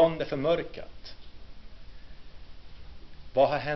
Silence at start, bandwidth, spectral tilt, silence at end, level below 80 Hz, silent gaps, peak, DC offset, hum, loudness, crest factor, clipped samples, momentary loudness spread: 0 s; 6.2 kHz; -4 dB/octave; 0 s; -48 dBFS; none; -12 dBFS; under 0.1%; none; -28 LUFS; 20 dB; under 0.1%; 27 LU